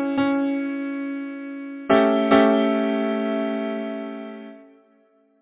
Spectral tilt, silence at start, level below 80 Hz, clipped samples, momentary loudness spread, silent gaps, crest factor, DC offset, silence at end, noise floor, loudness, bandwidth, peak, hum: -9.5 dB/octave; 0 s; -62 dBFS; under 0.1%; 17 LU; none; 20 dB; under 0.1%; 0.8 s; -60 dBFS; -22 LUFS; 4 kHz; -2 dBFS; none